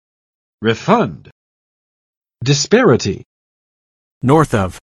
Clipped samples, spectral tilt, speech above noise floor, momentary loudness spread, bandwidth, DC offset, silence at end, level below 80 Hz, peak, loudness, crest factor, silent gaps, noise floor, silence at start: under 0.1%; -5.5 dB/octave; over 76 dB; 11 LU; 12.5 kHz; under 0.1%; 0.15 s; -46 dBFS; 0 dBFS; -15 LUFS; 18 dB; 1.32-2.21 s, 3.25-4.21 s; under -90 dBFS; 0.6 s